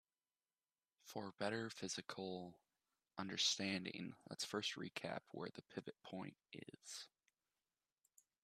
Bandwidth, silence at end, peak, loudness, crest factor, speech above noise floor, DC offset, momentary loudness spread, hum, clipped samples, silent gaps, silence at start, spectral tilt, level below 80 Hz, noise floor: 14 kHz; 1.35 s; -26 dBFS; -46 LUFS; 24 dB; over 42 dB; under 0.1%; 17 LU; none; under 0.1%; none; 1.05 s; -3 dB/octave; -88 dBFS; under -90 dBFS